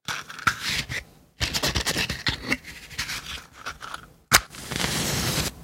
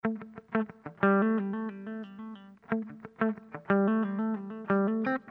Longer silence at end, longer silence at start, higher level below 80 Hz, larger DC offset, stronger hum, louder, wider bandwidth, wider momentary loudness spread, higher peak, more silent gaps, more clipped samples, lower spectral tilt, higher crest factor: about the same, 0 s vs 0 s; about the same, 0.1 s vs 0.05 s; first, -42 dBFS vs -74 dBFS; neither; neither; first, -26 LUFS vs -30 LUFS; first, 17 kHz vs 4.2 kHz; about the same, 16 LU vs 15 LU; first, 0 dBFS vs -10 dBFS; neither; neither; second, -2 dB/octave vs -10.5 dB/octave; first, 28 dB vs 20 dB